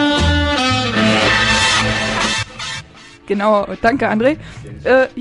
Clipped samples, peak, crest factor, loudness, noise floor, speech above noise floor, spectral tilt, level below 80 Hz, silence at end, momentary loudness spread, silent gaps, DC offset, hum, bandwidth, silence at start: under 0.1%; 0 dBFS; 16 dB; -15 LUFS; -38 dBFS; 23 dB; -4 dB/octave; -30 dBFS; 0 s; 13 LU; none; under 0.1%; none; 11.5 kHz; 0 s